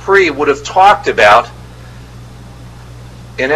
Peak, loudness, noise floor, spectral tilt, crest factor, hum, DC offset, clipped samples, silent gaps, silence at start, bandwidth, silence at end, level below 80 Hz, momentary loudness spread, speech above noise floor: 0 dBFS; -9 LUFS; -32 dBFS; -4 dB/octave; 12 dB; none; under 0.1%; 0.4%; none; 0 s; 13.5 kHz; 0 s; -38 dBFS; 15 LU; 23 dB